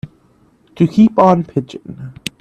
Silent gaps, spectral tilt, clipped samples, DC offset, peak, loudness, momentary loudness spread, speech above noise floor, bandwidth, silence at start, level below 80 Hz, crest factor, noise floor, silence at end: none; -7.5 dB/octave; under 0.1%; under 0.1%; 0 dBFS; -13 LUFS; 21 LU; 39 dB; 13.5 kHz; 0.05 s; -50 dBFS; 16 dB; -52 dBFS; 0.3 s